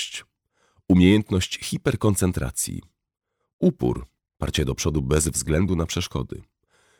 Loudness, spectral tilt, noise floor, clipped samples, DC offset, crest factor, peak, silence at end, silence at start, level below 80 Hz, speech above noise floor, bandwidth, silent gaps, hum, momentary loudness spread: -23 LUFS; -5 dB/octave; -66 dBFS; under 0.1%; under 0.1%; 20 dB; -4 dBFS; 0.6 s; 0 s; -38 dBFS; 44 dB; 19 kHz; 3.53-3.59 s; none; 14 LU